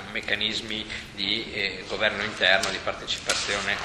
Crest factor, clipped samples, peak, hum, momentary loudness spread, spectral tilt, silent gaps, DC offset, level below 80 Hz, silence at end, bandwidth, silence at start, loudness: 24 dB; under 0.1%; -4 dBFS; none; 9 LU; -1.5 dB/octave; none; under 0.1%; -52 dBFS; 0 s; 15.5 kHz; 0 s; -25 LUFS